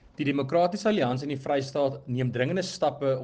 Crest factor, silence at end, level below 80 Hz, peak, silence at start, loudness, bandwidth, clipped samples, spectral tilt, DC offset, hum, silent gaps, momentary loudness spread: 16 dB; 0 s; -64 dBFS; -12 dBFS; 0.2 s; -27 LUFS; 9.4 kHz; under 0.1%; -6 dB/octave; under 0.1%; none; none; 4 LU